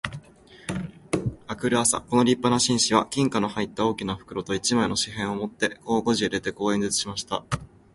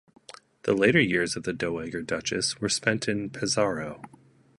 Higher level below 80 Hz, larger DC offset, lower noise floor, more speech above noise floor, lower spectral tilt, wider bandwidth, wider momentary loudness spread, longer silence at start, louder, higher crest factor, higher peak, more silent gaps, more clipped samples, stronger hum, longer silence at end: first, -52 dBFS vs -58 dBFS; neither; about the same, -50 dBFS vs -49 dBFS; about the same, 25 dB vs 23 dB; about the same, -3.5 dB/octave vs -4 dB/octave; about the same, 12 kHz vs 11.5 kHz; about the same, 12 LU vs 12 LU; second, 0.05 s vs 0.65 s; about the same, -25 LUFS vs -26 LUFS; about the same, 22 dB vs 22 dB; about the same, -4 dBFS vs -6 dBFS; neither; neither; neither; second, 0.3 s vs 0.5 s